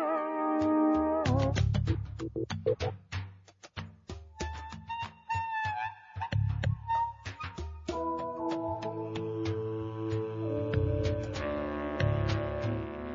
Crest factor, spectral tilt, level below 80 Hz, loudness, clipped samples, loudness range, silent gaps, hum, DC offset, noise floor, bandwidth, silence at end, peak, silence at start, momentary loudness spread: 18 dB; -7.5 dB/octave; -46 dBFS; -33 LUFS; under 0.1%; 7 LU; none; none; under 0.1%; -53 dBFS; 7.6 kHz; 0 s; -16 dBFS; 0 s; 13 LU